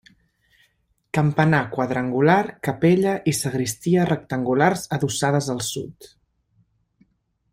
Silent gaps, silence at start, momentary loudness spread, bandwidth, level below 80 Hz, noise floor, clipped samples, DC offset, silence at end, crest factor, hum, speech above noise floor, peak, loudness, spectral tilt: none; 1.15 s; 8 LU; 16 kHz; -56 dBFS; -67 dBFS; under 0.1%; under 0.1%; 1.45 s; 20 dB; none; 46 dB; -2 dBFS; -21 LUFS; -5.5 dB/octave